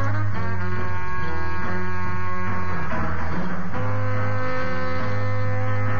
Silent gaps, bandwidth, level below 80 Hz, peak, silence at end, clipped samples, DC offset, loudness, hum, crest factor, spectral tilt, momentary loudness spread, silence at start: none; 6.8 kHz; -42 dBFS; -10 dBFS; 0 s; under 0.1%; 10%; -27 LUFS; none; 12 dB; -8 dB/octave; 3 LU; 0 s